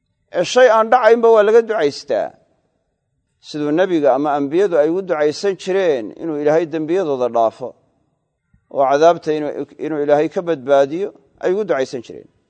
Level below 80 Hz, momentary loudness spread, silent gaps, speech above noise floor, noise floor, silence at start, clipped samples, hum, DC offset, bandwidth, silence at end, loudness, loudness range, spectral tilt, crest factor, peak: -68 dBFS; 14 LU; none; 54 dB; -69 dBFS; 0.35 s; under 0.1%; none; under 0.1%; 9 kHz; 0.3 s; -16 LUFS; 4 LU; -5 dB/octave; 16 dB; 0 dBFS